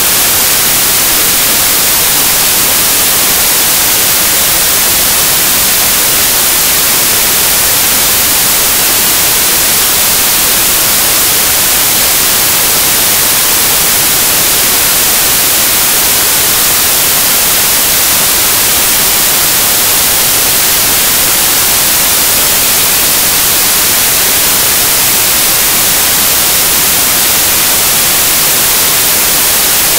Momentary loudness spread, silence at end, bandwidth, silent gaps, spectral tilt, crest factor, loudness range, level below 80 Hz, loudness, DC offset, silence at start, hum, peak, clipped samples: 0 LU; 0 s; over 20 kHz; none; 0 dB/octave; 8 dB; 0 LU; -34 dBFS; -5 LUFS; under 0.1%; 0 s; none; 0 dBFS; 0.6%